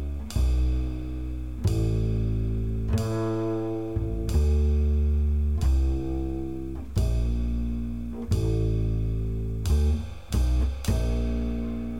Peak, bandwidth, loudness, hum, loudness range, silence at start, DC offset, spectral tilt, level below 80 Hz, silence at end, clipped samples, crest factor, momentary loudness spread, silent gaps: -12 dBFS; 14 kHz; -28 LUFS; none; 2 LU; 0 s; 0.8%; -7.5 dB/octave; -28 dBFS; 0 s; under 0.1%; 12 dB; 7 LU; none